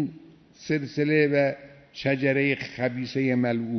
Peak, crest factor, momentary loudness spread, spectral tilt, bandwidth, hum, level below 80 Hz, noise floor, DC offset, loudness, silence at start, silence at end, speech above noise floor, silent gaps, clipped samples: -8 dBFS; 18 dB; 11 LU; -7 dB/octave; 6.4 kHz; none; -66 dBFS; -50 dBFS; under 0.1%; -25 LUFS; 0 s; 0 s; 25 dB; none; under 0.1%